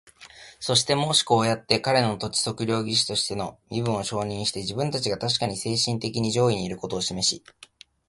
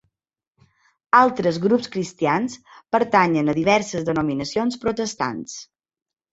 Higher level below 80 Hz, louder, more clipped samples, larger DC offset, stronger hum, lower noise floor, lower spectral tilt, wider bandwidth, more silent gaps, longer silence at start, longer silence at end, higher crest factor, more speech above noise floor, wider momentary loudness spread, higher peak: about the same, -56 dBFS vs -58 dBFS; second, -24 LUFS vs -21 LUFS; neither; neither; neither; second, -48 dBFS vs -84 dBFS; second, -3.5 dB/octave vs -5 dB/octave; first, 11.5 kHz vs 8 kHz; neither; second, 0.2 s vs 1.15 s; about the same, 0.7 s vs 0.7 s; about the same, 24 dB vs 20 dB; second, 23 dB vs 63 dB; second, 8 LU vs 12 LU; about the same, -2 dBFS vs -2 dBFS